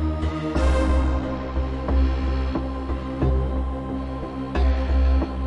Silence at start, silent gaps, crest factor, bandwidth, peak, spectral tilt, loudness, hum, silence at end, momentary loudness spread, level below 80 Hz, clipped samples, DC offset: 0 s; none; 12 dB; 7.8 kHz; -10 dBFS; -8 dB/octave; -24 LUFS; none; 0 s; 8 LU; -24 dBFS; under 0.1%; 0.3%